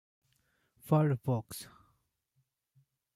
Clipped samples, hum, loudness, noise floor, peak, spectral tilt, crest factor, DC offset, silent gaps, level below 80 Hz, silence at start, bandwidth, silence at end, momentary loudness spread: under 0.1%; none; -31 LUFS; -79 dBFS; -16 dBFS; -7.5 dB/octave; 20 dB; under 0.1%; none; -70 dBFS; 0.85 s; 15.5 kHz; 1.5 s; 17 LU